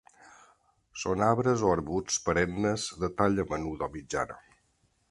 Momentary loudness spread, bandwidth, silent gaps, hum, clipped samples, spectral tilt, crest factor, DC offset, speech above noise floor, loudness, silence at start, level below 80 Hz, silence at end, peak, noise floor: 11 LU; 11.5 kHz; none; none; under 0.1%; -5 dB/octave; 22 dB; under 0.1%; 42 dB; -29 LUFS; 0.95 s; -52 dBFS; 0.75 s; -8 dBFS; -71 dBFS